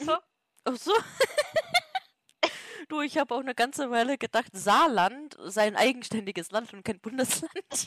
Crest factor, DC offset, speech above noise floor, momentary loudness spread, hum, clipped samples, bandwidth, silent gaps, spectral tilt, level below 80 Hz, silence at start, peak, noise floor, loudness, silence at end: 20 dB; under 0.1%; 20 dB; 12 LU; none; under 0.1%; 15 kHz; none; -2.5 dB/octave; -68 dBFS; 0 s; -8 dBFS; -48 dBFS; -28 LUFS; 0 s